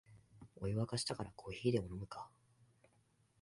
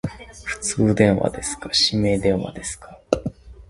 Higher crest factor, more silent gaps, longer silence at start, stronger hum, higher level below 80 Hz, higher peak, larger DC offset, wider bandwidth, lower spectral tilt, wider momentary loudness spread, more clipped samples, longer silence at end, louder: about the same, 22 dB vs 22 dB; neither; about the same, 0.1 s vs 0.05 s; neither; second, -64 dBFS vs -42 dBFS; second, -22 dBFS vs 0 dBFS; neither; about the same, 11.5 kHz vs 11.5 kHz; about the same, -5.5 dB/octave vs -4.5 dB/octave; first, 19 LU vs 15 LU; neither; first, 1.15 s vs 0.05 s; second, -41 LUFS vs -21 LUFS